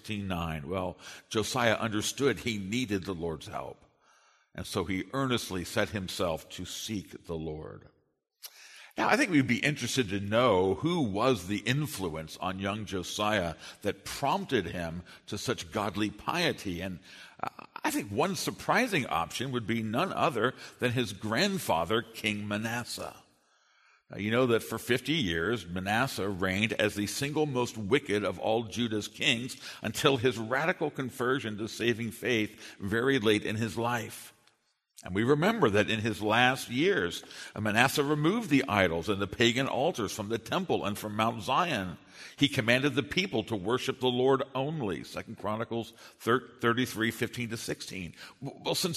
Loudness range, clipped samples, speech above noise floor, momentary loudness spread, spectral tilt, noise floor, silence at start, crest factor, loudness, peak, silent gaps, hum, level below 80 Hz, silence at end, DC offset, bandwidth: 6 LU; under 0.1%; 41 dB; 13 LU; -4.5 dB/octave; -72 dBFS; 0.05 s; 26 dB; -30 LUFS; -6 dBFS; none; none; -60 dBFS; 0 s; under 0.1%; 13.5 kHz